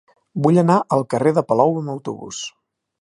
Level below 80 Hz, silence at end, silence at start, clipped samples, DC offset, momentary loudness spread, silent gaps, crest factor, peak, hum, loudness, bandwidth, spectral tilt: -62 dBFS; 0.55 s; 0.35 s; under 0.1%; under 0.1%; 14 LU; none; 18 dB; -2 dBFS; none; -18 LUFS; 11.5 kHz; -7 dB/octave